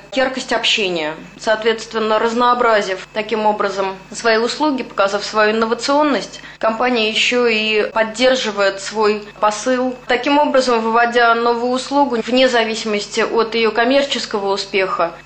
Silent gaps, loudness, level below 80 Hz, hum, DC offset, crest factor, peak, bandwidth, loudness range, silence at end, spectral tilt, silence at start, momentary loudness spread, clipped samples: none; -16 LUFS; -52 dBFS; none; under 0.1%; 14 dB; -2 dBFS; 9 kHz; 2 LU; 0.05 s; -3 dB/octave; 0.05 s; 6 LU; under 0.1%